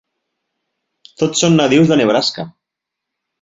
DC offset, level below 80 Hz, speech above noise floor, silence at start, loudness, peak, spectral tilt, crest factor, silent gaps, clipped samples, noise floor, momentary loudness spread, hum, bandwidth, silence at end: under 0.1%; -56 dBFS; 68 dB; 1.2 s; -13 LUFS; 0 dBFS; -4.5 dB/octave; 16 dB; none; under 0.1%; -81 dBFS; 14 LU; none; 7.8 kHz; 0.95 s